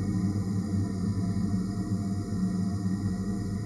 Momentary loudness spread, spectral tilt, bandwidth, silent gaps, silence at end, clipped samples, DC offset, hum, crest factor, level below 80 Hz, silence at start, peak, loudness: 2 LU; -8 dB/octave; 12 kHz; none; 0 s; under 0.1%; under 0.1%; none; 12 dB; -46 dBFS; 0 s; -18 dBFS; -30 LUFS